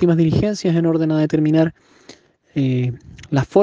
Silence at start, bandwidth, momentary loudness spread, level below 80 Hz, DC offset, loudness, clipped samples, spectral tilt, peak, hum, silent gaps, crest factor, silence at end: 0 s; 7.6 kHz; 8 LU; -46 dBFS; under 0.1%; -18 LUFS; under 0.1%; -8 dB/octave; 0 dBFS; none; none; 16 dB; 0 s